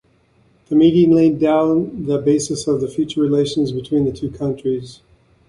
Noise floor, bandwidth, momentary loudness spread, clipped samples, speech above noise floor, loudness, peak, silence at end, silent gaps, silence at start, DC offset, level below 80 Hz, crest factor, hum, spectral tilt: -56 dBFS; 11.5 kHz; 10 LU; under 0.1%; 40 dB; -17 LUFS; -2 dBFS; 0.55 s; none; 0.7 s; under 0.1%; -48 dBFS; 14 dB; none; -6.5 dB/octave